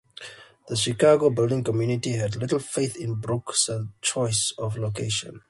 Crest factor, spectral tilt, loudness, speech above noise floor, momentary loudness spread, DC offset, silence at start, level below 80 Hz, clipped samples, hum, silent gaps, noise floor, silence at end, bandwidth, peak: 18 dB; -4.5 dB/octave; -24 LUFS; 20 dB; 10 LU; under 0.1%; 0.2 s; -56 dBFS; under 0.1%; none; none; -44 dBFS; 0.1 s; 11.5 kHz; -6 dBFS